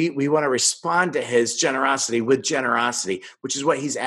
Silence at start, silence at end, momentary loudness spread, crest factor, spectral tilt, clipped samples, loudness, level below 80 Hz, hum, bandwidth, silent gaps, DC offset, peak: 0 s; 0 s; 5 LU; 16 dB; -3 dB/octave; under 0.1%; -21 LUFS; -74 dBFS; none; 12.5 kHz; none; under 0.1%; -4 dBFS